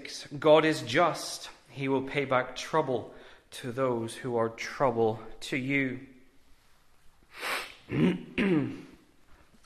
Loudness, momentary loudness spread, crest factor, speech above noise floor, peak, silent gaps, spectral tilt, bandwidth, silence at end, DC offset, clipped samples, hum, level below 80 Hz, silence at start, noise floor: -29 LUFS; 14 LU; 22 dB; 31 dB; -8 dBFS; none; -5.5 dB/octave; 14 kHz; 0.35 s; under 0.1%; under 0.1%; none; -60 dBFS; 0 s; -59 dBFS